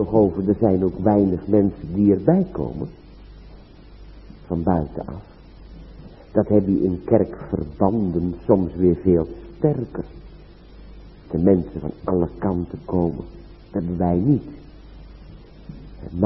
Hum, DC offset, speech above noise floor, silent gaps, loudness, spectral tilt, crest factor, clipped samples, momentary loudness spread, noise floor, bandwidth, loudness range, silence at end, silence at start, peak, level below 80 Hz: none; under 0.1%; 23 dB; none; -21 LUFS; -13.5 dB/octave; 20 dB; under 0.1%; 16 LU; -43 dBFS; 5.6 kHz; 6 LU; 0 s; 0 s; 0 dBFS; -42 dBFS